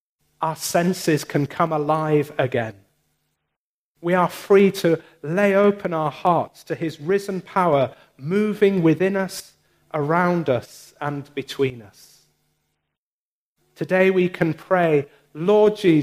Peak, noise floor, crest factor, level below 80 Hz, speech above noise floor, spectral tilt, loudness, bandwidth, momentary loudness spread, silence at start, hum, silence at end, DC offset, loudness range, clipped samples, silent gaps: -4 dBFS; under -90 dBFS; 18 dB; -64 dBFS; over 70 dB; -6 dB/octave; -21 LUFS; 15.5 kHz; 12 LU; 0.4 s; none; 0 s; under 0.1%; 5 LU; under 0.1%; 3.56-3.95 s, 12.98-13.56 s